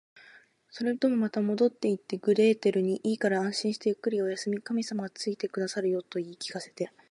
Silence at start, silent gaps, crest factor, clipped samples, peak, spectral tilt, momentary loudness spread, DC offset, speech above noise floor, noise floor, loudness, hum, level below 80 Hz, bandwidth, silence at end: 0.15 s; none; 16 dB; under 0.1%; -12 dBFS; -5.5 dB/octave; 12 LU; under 0.1%; 29 dB; -57 dBFS; -29 LUFS; none; -80 dBFS; 11.5 kHz; 0.25 s